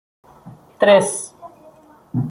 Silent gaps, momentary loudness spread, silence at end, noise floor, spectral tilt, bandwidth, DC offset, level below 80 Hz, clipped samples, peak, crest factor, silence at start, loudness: none; 15 LU; 0 s; -48 dBFS; -4.5 dB/octave; 12 kHz; under 0.1%; -60 dBFS; under 0.1%; -2 dBFS; 18 dB; 0.45 s; -17 LUFS